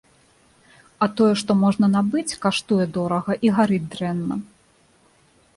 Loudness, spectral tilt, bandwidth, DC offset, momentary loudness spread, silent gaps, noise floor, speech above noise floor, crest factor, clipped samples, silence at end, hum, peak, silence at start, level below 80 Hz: -21 LUFS; -6 dB/octave; 11.5 kHz; under 0.1%; 8 LU; none; -58 dBFS; 38 dB; 16 dB; under 0.1%; 1.1 s; none; -6 dBFS; 1 s; -58 dBFS